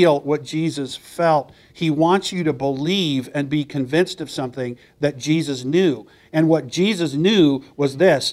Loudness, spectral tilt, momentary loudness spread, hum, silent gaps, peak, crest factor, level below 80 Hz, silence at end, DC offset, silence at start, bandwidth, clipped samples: -20 LUFS; -5.5 dB/octave; 10 LU; none; none; -2 dBFS; 18 dB; -58 dBFS; 0 s; under 0.1%; 0 s; 14 kHz; under 0.1%